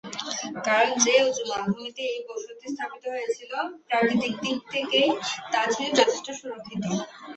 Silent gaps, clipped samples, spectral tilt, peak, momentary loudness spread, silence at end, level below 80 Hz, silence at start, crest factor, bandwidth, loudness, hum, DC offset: none; under 0.1%; -2.5 dB/octave; -4 dBFS; 13 LU; 0 s; -70 dBFS; 0.05 s; 22 dB; 8.4 kHz; -25 LUFS; none; under 0.1%